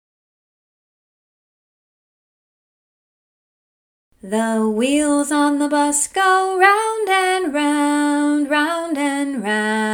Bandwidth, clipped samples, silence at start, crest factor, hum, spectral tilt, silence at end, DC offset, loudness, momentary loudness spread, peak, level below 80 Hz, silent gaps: 17.5 kHz; under 0.1%; 4.25 s; 20 dB; none; -3 dB/octave; 0 s; under 0.1%; -17 LUFS; 7 LU; 0 dBFS; -62 dBFS; none